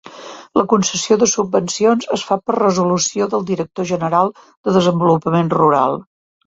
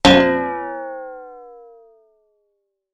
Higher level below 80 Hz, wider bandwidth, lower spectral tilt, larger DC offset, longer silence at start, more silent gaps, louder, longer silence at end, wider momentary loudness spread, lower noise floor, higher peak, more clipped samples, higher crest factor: second, -56 dBFS vs -44 dBFS; second, 8 kHz vs 12 kHz; about the same, -5 dB/octave vs -4.5 dB/octave; neither; about the same, 0.05 s vs 0.05 s; first, 4.57-4.64 s vs none; about the same, -16 LUFS vs -18 LUFS; second, 0.45 s vs 1.4 s; second, 7 LU vs 27 LU; second, -35 dBFS vs -71 dBFS; about the same, -2 dBFS vs 0 dBFS; neither; about the same, 16 dB vs 20 dB